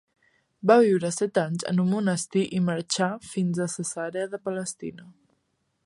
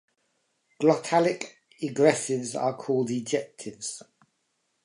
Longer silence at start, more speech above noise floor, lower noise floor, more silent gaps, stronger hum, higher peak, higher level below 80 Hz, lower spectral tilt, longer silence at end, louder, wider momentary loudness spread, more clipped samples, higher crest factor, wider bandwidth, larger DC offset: second, 0.65 s vs 0.8 s; about the same, 49 dB vs 49 dB; about the same, -74 dBFS vs -75 dBFS; neither; neither; first, -4 dBFS vs -8 dBFS; first, -70 dBFS vs -78 dBFS; about the same, -5.5 dB/octave vs -4.5 dB/octave; about the same, 0.75 s vs 0.85 s; about the same, -25 LUFS vs -27 LUFS; about the same, 12 LU vs 13 LU; neither; about the same, 22 dB vs 20 dB; about the same, 11.5 kHz vs 11.5 kHz; neither